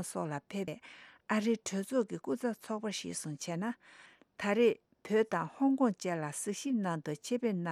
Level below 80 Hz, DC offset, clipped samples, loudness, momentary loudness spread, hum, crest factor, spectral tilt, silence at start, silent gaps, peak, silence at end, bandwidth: -80 dBFS; under 0.1%; under 0.1%; -34 LUFS; 11 LU; none; 18 dB; -5 dB/octave; 0 s; none; -18 dBFS; 0 s; 15 kHz